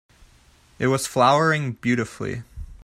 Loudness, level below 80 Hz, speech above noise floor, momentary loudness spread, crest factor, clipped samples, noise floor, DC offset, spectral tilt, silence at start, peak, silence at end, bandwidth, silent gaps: -22 LUFS; -46 dBFS; 34 dB; 14 LU; 18 dB; under 0.1%; -55 dBFS; under 0.1%; -5 dB/octave; 0.8 s; -4 dBFS; 0.05 s; 16 kHz; none